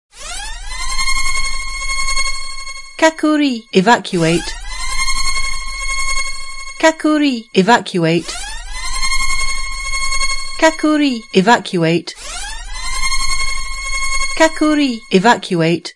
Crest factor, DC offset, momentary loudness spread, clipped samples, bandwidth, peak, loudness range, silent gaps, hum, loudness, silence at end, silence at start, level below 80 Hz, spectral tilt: 16 dB; under 0.1%; 13 LU; under 0.1%; 11.5 kHz; 0 dBFS; 2 LU; none; none; -16 LUFS; 0.05 s; 0.15 s; -26 dBFS; -3.5 dB/octave